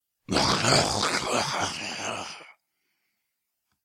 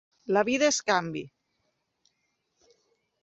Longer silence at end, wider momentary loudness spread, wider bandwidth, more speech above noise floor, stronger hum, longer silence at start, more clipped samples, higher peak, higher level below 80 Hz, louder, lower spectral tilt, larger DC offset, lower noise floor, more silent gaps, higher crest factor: second, 1.35 s vs 1.95 s; about the same, 14 LU vs 15 LU; first, 16.5 kHz vs 8.4 kHz; first, 56 dB vs 51 dB; neither; about the same, 0.3 s vs 0.3 s; neither; about the same, -8 dBFS vs -10 dBFS; first, -52 dBFS vs -72 dBFS; about the same, -25 LUFS vs -26 LUFS; about the same, -2.5 dB/octave vs -3 dB/octave; neither; about the same, -80 dBFS vs -77 dBFS; neither; about the same, 20 dB vs 22 dB